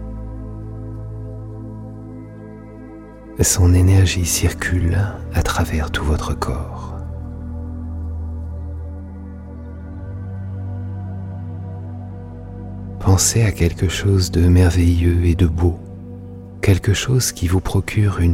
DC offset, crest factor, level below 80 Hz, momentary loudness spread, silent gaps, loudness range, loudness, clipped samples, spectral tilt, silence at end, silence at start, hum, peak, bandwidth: under 0.1%; 18 dB; -30 dBFS; 20 LU; none; 14 LU; -19 LUFS; under 0.1%; -5 dB/octave; 0 s; 0 s; none; -2 dBFS; 16 kHz